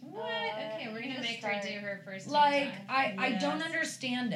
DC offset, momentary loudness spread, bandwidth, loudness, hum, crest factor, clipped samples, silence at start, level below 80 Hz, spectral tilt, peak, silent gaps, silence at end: under 0.1%; 11 LU; 13.5 kHz; -32 LUFS; none; 18 dB; under 0.1%; 0 s; under -90 dBFS; -4 dB/octave; -14 dBFS; none; 0 s